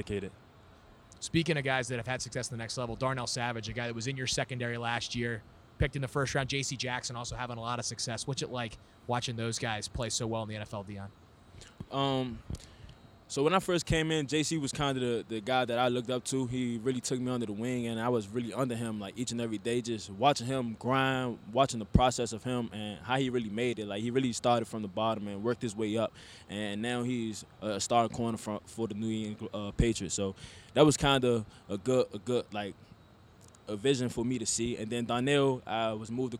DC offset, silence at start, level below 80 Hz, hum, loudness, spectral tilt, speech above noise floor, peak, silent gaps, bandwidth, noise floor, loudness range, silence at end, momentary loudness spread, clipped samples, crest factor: under 0.1%; 0 s; -50 dBFS; none; -32 LUFS; -4.5 dB/octave; 25 dB; -10 dBFS; none; 16 kHz; -58 dBFS; 5 LU; 0 s; 10 LU; under 0.1%; 24 dB